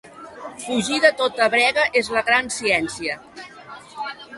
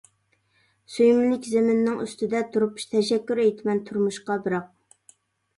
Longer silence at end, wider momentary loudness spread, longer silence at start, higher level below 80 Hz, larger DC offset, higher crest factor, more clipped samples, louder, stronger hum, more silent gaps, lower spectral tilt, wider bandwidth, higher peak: second, 0 s vs 0.9 s; first, 22 LU vs 9 LU; second, 0.05 s vs 0.9 s; first, -58 dBFS vs -70 dBFS; neither; about the same, 20 dB vs 16 dB; neither; first, -19 LUFS vs -24 LUFS; neither; neither; second, -2.5 dB/octave vs -5.5 dB/octave; about the same, 11.5 kHz vs 11.5 kHz; first, -2 dBFS vs -8 dBFS